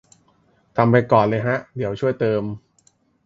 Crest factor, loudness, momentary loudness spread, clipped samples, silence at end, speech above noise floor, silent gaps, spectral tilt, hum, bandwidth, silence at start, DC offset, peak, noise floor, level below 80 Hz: 20 dB; -20 LUFS; 13 LU; under 0.1%; 0.65 s; 42 dB; none; -8.5 dB/octave; none; 7.8 kHz; 0.75 s; under 0.1%; 0 dBFS; -61 dBFS; -56 dBFS